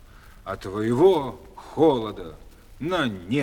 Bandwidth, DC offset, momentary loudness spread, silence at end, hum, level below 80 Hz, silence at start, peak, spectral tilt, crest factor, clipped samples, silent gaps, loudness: 16 kHz; under 0.1%; 21 LU; 0 s; none; -48 dBFS; 0.45 s; -6 dBFS; -7 dB/octave; 18 dB; under 0.1%; none; -23 LUFS